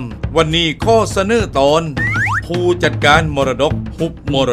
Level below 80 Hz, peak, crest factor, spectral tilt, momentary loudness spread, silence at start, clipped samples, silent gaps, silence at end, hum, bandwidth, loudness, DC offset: -30 dBFS; 0 dBFS; 14 dB; -5 dB/octave; 7 LU; 0 s; under 0.1%; none; 0 s; none; 14.5 kHz; -15 LUFS; under 0.1%